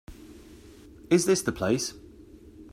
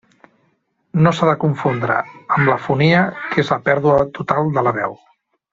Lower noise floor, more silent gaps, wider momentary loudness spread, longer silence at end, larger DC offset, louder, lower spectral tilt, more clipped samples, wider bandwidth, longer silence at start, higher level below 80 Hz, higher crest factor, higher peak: second, -50 dBFS vs -64 dBFS; neither; first, 26 LU vs 6 LU; second, 0.05 s vs 0.6 s; neither; second, -26 LUFS vs -17 LUFS; second, -4.5 dB/octave vs -7.5 dB/octave; neither; first, 15.5 kHz vs 7.6 kHz; second, 0.1 s vs 0.95 s; about the same, -54 dBFS vs -52 dBFS; about the same, 20 dB vs 16 dB; second, -10 dBFS vs 0 dBFS